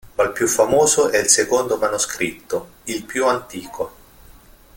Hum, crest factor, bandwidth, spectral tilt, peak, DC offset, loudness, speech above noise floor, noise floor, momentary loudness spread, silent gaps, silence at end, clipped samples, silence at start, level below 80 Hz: none; 20 dB; 17 kHz; -2 dB/octave; 0 dBFS; under 0.1%; -18 LUFS; 27 dB; -46 dBFS; 14 LU; none; 0.85 s; under 0.1%; 0.05 s; -50 dBFS